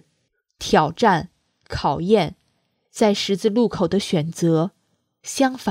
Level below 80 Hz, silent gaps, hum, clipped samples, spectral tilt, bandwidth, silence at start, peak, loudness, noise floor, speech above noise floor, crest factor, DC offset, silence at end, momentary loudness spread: -50 dBFS; none; none; under 0.1%; -5.5 dB/octave; 16 kHz; 0.6 s; -2 dBFS; -20 LUFS; -71 dBFS; 51 dB; 18 dB; under 0.1%; 0 s; 13 LU